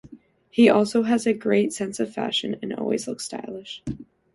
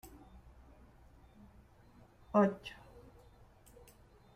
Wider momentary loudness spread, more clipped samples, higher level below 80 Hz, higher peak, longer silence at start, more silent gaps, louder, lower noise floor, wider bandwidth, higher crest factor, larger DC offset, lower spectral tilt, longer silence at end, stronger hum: second, 17 LU vs 29 LU; neither; first, -58 dBFS vs -64 dBFS; first, -2 dBFS vs -16 dBFS; about the same, 0.05 s vs 0.05 s; neither; first, -23 LUFS vs -34 LUFS; second, -49 dBFS vs -62 dBFS; second, 11.5 kHz vs 15.5 kHz; about the same, 22 dB vs 24 dB; neither; second, -4.5 dB/octave vs -7.5 dB/octave; second, 0.3 s vs 1.65 s; neither